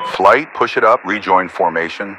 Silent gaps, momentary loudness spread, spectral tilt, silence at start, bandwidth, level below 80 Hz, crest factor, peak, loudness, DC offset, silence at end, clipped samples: none; 6 LU; -5 dB/octave; 0 s; 12.5 kHz; -58 dBFS; 14 dB; 0 dBFS; -14 LUFS; under 0.1%; 0 s; 0.3%